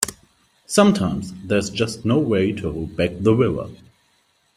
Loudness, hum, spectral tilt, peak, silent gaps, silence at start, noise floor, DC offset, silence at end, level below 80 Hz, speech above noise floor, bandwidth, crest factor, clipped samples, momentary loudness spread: -20 LUFS; none; -5.5 dB/octave; 0 dBFS; none; 0 s; -63 dBFS; under 0.1%; 0.8 s; -48 dBFS; 43 dB; 16 kHz; 20 dB; under 0.1%; 11 LU